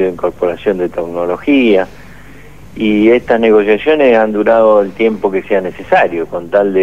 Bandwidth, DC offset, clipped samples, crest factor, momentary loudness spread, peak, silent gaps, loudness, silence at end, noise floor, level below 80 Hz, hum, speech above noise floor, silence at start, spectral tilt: 8.2 kHz; 1%; under 0.1%; 12 dB; 8 LU; 0 dBFS; none; -12 LUFS; 0 s; -36 dBFS; -44 dBFS; 50 Hz at -40 dBFS; 25 dB; 0 s; -7 dB/octave